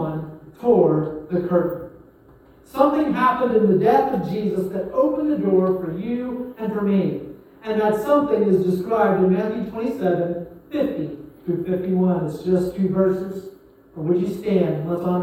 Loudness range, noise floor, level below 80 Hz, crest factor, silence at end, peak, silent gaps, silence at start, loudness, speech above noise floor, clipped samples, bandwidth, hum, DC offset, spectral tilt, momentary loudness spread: 3 LU; -50 dBFS; -54 dBFS; 18 dB; 0 s; -2 dBFS; none; 0 s; -21 LUFS; 30 dB; under 0.1%; 16.5 kHz; none; under 0.1%; -9 dB/octave; 12 LU